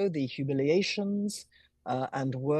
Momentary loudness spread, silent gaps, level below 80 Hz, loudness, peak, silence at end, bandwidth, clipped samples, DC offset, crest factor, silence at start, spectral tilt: 9 LU; none; -72 dBFS; -30 LUFS; -16 dBFS; 0 s; 12.5 kHz; under 0.1%; under 0.1%; 14 dB; 0 s; -6 dB/octave